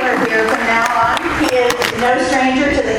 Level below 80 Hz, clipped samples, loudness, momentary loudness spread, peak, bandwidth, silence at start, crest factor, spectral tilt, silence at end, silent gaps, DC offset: -38 dBFS; under 0.1%; -14 LUFS; 2 LU; 0 dBFS; 17.5 kHz; 0 s; 14 dB; -3.5 dB/octave; 0 s; none; under 0.1%